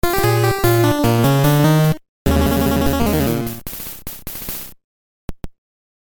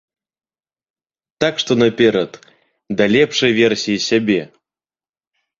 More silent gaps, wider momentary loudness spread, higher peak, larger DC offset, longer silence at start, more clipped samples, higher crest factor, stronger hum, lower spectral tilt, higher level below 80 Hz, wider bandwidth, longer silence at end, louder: first, 2.09-2.25 s, 4.84-5.28 s vs none; first, 15 LU vs 7 LU; about the same, 0 dBFS vs -2 dBFS; neither; second, 0.05 s vs 1.4 s; neither; about the same, 16 dB vs 18 dB; neither; first, -6 dB/octave vs -4.5 dB/octave; first, -30 dBFS vs -56 dBFS; first, over 20 kHz vs 7.6 kHz; second, 0.55 s vs 1.15 s; about the same, -17 LUFS vs -16 LUFS